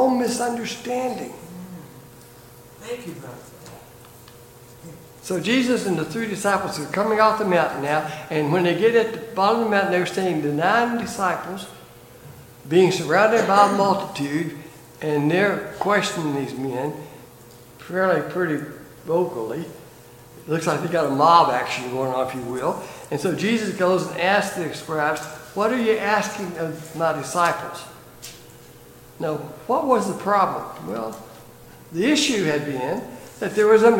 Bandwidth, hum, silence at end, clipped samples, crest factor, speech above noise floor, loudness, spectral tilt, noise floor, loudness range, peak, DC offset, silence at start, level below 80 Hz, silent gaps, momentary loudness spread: 17 kHz; none; 0 s; under 0.1%; 22 dB; 24 dB; -22 LUFS; -5 dB/octave; -45 dBFS; 7 LU; -2 dBFS; under 0.1%; 0 s; -60 dBFS; none; 20 LU